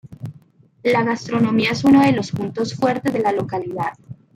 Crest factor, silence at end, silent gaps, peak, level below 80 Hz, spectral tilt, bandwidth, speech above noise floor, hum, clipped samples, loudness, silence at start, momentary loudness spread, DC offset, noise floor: 16 dB; 0.25 s; none; -4 dBFS; -56 dBFS; -6.5 dB/octave; 14.5 kHz; 32 dB; none; under 0.1%; -19 LUFS; 0.1 s; 13 LU; under 0.1%; -50 dBFS